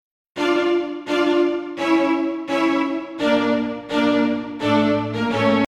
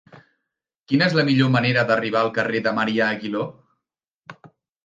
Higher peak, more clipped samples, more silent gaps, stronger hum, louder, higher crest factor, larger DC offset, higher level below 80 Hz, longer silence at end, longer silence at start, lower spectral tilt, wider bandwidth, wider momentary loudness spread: about the same, -6 dBFS vs -4 dBFS; neither; second, none vs 0.76-0.81 s, 4.13-4.18 s; neither; about the same, -20 LUFS vs -20 LUFS; about the same, 14 dB vs 18 dB; neither; first, -56 dBFS vs -66 dBFS; second, 0 s vs 0.4 s; first, 0.35 s vs 0.15 s; about the same, -6 dB/octave vs -7 dB/octave; first, 11 kHz vs 8.8 kHz; second, 5 LU vs 9 LU